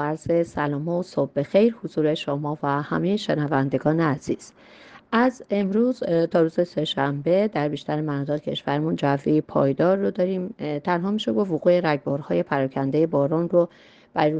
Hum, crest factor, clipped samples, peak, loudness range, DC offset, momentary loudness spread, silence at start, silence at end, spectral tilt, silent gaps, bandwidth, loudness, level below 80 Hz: none; 16 dB; under 0.1%; -6 dBFS; 1 LU; under 0.1%; 6 LU; 0 s; 0 s; -7.5 dB/octave; none; 9 kHz; -23 LUFS; -60 dBFS